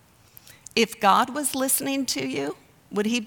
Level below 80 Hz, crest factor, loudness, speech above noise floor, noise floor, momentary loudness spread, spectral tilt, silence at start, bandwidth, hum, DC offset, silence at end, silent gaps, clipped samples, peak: -64 dBFS; 20 dB; -24 LUFS; 28 dB; -52 dBFS; 12 LU; -2.5 dB/octave; 0.75 s; over 20 kHz; none; under 0.1%; 0 s; none; under 0.1%; -6 dBFS